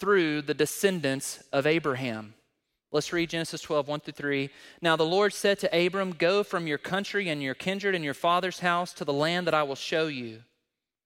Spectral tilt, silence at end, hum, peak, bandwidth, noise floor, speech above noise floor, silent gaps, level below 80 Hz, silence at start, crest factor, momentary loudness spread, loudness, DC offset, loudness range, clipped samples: -4.5 dB/octave; 0.65 s; none; -10 dBFS; 16.5 kHz; -83 dBFS; 55 dB; none; -68 dBFS; 0 s; 18 dB; 7 LU; -28 LUFS; under 0.1%; 3 LU; under 0.1%